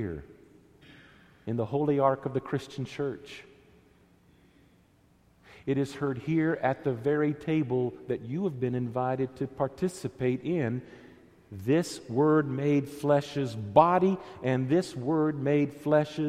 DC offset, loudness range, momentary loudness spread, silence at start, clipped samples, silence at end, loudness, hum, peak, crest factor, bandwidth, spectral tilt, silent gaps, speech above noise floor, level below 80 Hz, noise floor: under 0.1%; 9 LU; 11 LU; 0 s; under 0.1%; 0 s; -29 LUFS; none; -6 dBFS; 24 dB; 14.5 kHz; -7.5 dB/octave; none; 35 dB; -62 dBFS; -63 dBFS